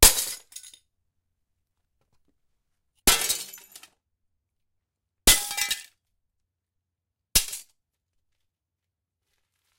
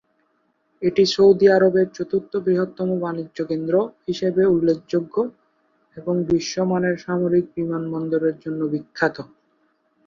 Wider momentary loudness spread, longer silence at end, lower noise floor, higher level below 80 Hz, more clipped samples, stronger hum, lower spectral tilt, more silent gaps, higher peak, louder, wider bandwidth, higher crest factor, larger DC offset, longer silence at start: first, 20 LU vs 12 LU; first, 2.15 s vs 0.8 s; first, -86 dBFS vs -67 dBFS; first, -40 dBFS vs -58 dBFS; neither; neither; second, 0 dB/octave vs -6.5 dB/octave; neither; first, 0 dBFS vs -4 dBFS; about the same, -22 LUFS vs -21 LUFS; first, 16.5 kHz vs 7.4 kHz; first, 30 dB vs 18 dB; neither; second, 0 s vs 0.8 s